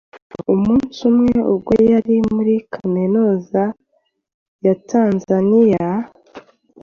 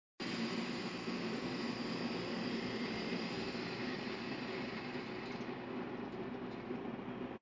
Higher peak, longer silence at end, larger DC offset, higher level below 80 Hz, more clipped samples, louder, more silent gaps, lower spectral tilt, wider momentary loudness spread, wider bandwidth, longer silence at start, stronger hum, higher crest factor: first, -2 dBFS vs -26 dBFS; first, 0.45 s vs 0.05 s; neither; first, -48 dBFS vs -68 dBFS; neither; first, -16 LUFS vs -42 LUFS; first, 0.22-0.30 s, 4.34-4.59 s vs none; first, -8.5 dB/octave vs -5.5 dB/octave; first, 8 LU vs 5 LU; second, 6.8 kHz vs 7.6 kHz; about the same, 0.15 s vs 0.2 s; neither; about the same, 14 dB vs 14 dB